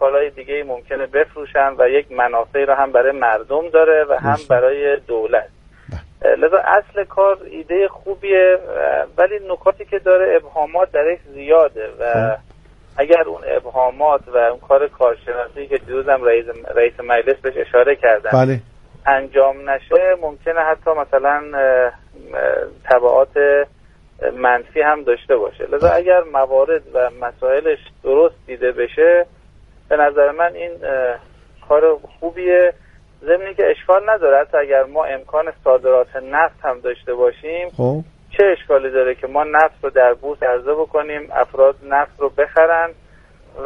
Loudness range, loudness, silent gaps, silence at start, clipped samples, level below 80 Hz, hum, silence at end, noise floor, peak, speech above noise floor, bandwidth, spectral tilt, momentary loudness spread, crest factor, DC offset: 2 LU; -16 LUFS; none; 0 s; under 0.1%; -46 dBFS; none; 0 s; -46 dBFS; 0 dBFS; 31 dB; 5.8 kHz; -7.5 dB/octave; 9 LU; 16 dB; under 0.1%